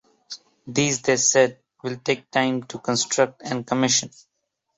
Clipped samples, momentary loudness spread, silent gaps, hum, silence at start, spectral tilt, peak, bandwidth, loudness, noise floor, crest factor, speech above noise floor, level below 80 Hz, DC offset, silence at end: under 0.1%; 21 LU; none; none; 0.3 s; -3 dB/octave; -4 dBFS; 8.4 kHz; -22 LUFS; -43 dBFS; 20 dB; 21 dB; -64 dBFS; under 0.1%; 0.7 s